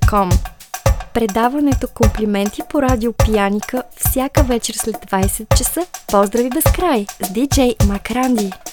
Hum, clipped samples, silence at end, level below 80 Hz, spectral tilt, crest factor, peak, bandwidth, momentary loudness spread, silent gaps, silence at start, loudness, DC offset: none; under 0.1%; 0 s; -24 dBFS; -5 dB/octave; 16 dB; 0 dBFS; over 20 kHz; 5 LU; none; 0 s; -17 LUFS; under 0.1%